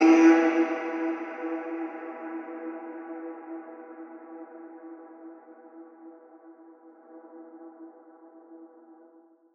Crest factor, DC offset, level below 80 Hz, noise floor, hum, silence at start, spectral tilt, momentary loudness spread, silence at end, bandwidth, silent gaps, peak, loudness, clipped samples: 22 dB; under 0.1%; under -90 dBFS; -57 dBFS; none; 0 s; -3.5 dB/octave; 26 LU; 0.9 s; 6.8 kHz; none; -8 dBFS; -27 LUFS; under 0.1%